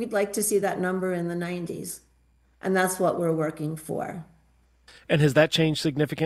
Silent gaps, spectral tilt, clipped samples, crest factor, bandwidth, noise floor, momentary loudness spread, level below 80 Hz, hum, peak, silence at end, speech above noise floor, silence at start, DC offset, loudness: none; -5 dB/octave; under 0.1%; 22 dB; 15.5 kHz; -63 dBFS; 14 LU; -60 dBFS; none; -4 dBFS; 0 s; 37 dB; 0 s; under 0.1%; -25 LUFS